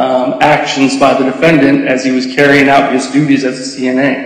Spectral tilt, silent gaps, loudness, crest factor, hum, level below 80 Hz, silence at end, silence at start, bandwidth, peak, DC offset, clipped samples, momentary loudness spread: -5 dB/octave; none; -10 LUFS; 10 dB; none; -48 dBFS; 0 s; 0 s; 10.5 kHz; 0 dBFS; under 0.1%; 0.1%; 6 LU